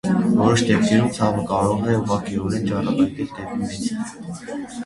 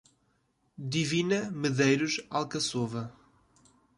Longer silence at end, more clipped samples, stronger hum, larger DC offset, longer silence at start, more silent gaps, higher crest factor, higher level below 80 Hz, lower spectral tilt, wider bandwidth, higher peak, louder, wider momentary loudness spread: second, 0 s vs 0.85 s; neither; neither; neither; second, 0.05 s vs 0.8 s; neither; about the same, 18 dB vs 18 dB; first, -46 dBFS vs -68 dBFS; first, -6 dB/octave vs -4.5 dB/octave; about the same, 11.5 kHz vs 11.5 kHz; first, -4 dBFS vs -14 dBFS; first, -21 LUFS vs -29 LUFS; about the same, 13 LU vs 12 LU